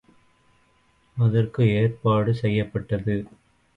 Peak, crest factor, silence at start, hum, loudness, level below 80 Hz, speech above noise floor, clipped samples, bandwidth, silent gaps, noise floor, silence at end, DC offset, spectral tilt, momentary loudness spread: -8 dBFS; 16 dB; 1.15 s; none; -23 LUFS; -50 dBFS; 41 dB; under 0.1%; 5.2 kHz; none; -62 dBFS; 0.5 s; under 0.1%; -9.5 dB/octave; 8 LU